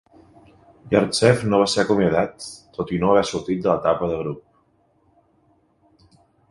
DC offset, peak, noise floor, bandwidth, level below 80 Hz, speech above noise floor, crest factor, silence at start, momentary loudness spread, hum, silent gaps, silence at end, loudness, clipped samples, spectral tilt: under 0.1%; 0 dBFS; -62 dBFS; 11.5 kHz; -50 dBFS; 42 dB; 22 dB; 0.85 s; 14 LU; none; none; 2.1 s; -20 LUFS; under 0.1%; -5.5 dB/octave